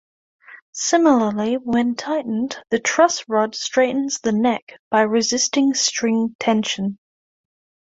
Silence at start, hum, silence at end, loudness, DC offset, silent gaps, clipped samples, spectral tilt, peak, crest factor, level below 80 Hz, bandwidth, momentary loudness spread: 0.5 s; none; 0.9 s; -19 LUFS; under 0.1%; 0.62-0.73 s, 4.62-4.67 s, 4.79-4.91 s, 6.35-6.39 s; under 0.1%; -3 dB/octave; 0 dBFS; 20 dB; -62 dBFS; 8 kHz; 8 LU